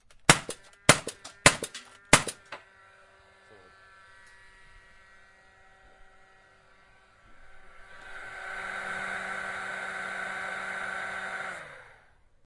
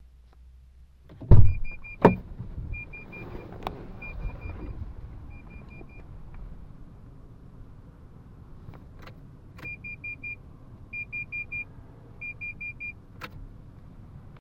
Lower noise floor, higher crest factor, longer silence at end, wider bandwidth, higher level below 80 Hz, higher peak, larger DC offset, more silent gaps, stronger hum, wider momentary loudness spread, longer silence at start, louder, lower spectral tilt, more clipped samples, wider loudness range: first, -60 dBFS vs -52 dBFS; about the same, 32 dB vs 28 dB; first, 0.55 s vs 0.2 s; first, 11.5 kHz vs 4.5 kHz; second, -54 dBFS vs -34 dBFS; about the same, 0 dBFS vs 0 dBFS; neither; neither; neither; second, 23 LU vs 27 LU; second, 0.3 s vs 1.2 s; first, -27 LUFS vs -30 LUFS; second, -2 dB/octave vs -9.5 dB/octave; neither; about the same, 21 LU vs 21 LU